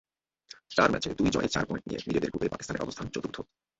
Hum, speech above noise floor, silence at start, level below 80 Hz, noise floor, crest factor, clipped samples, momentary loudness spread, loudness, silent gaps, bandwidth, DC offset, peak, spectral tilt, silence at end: none; 25 dB; 0.5 s; -52 dBFS; -55 dBFS; 22 dB; under 0.1%; 13 LU; -30 LUFS; none; 8.2 kHz; under 0.1%; -8 dBFS; -5 dB/octave; 0.35 s